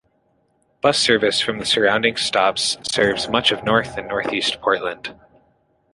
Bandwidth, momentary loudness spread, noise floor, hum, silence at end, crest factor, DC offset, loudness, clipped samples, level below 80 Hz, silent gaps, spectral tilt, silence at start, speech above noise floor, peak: 11.5 kHz; 8 LU; -64 dBFS; none; 0.8 s; 20 dB; under 0.1%; -18 LUFS; under 0.1%; -52 dBFS; none; -2.5 dB/octave; 0.85 s; 44 dB; -2 dBFS